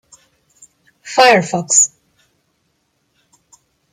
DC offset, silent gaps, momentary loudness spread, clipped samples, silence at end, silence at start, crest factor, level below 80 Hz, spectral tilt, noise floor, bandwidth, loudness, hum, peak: under 0.1%; none; 6 LU; under 0.1%; 2.05 s; 1.05 s; 18 dB; -66 dBFS; -2 dB/octave; -65 dBFS; 15.5 kHz; -12 LUFS; none; 0 dBFS